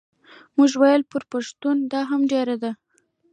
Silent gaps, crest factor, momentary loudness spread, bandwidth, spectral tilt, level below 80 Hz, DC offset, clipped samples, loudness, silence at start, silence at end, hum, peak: none; 16 dB; 12 LU; 9.2 kHz; -4 dB/octave; -76 dBFS; under 0.1%; under 0.1%; -21 LUFS; 0.55 s; 0.6 s; none; -6 dBFS